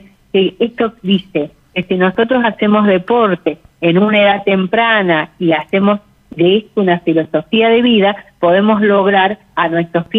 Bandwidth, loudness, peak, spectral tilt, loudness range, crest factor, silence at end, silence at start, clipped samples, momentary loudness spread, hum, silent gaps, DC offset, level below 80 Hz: 4.5 kHz; -13 LUFS; -2 dBFS; -8.5 dB/octave; 2 LU; 10 dB; 0 s; 0.35 s; under 0.1%; 7 LU; none; none; under 0.1%; -52 dBFS